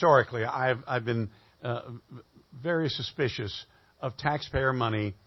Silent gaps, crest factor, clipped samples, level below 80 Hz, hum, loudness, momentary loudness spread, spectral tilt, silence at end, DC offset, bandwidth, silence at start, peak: none; 22 dB; under 0.1%; -52 dBFS; none; -30 LUFS; 12 LU; -6.5 dB/octave; 0.15 s; under 0.1%; 6.2 kHz; 0 s; -8 dBFS